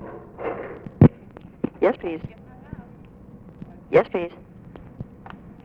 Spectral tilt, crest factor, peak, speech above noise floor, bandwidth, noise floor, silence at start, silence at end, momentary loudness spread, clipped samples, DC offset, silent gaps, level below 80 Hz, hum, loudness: -10.5 dB/octave; 24 dB; -2 dBFS; 23 dB; 5 kHz; -45 dBFS; 0 s; 0.15 s; 27 LU; under 0.1%; under 0.1%; none; -44 dBFS; none; -23 LUFS